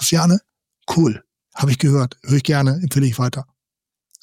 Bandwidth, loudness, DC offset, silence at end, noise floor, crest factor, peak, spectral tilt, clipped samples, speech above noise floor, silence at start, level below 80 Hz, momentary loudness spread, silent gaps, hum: 16 kHz; -18 LUFS; under 0.1%; 0.8 s; -87 dBFS; 12 dB; -6 dBFS; -5.5 dB/octave; under 0.1%; 70 dB; 0 s; -56 dBFS; 14 LU; none; none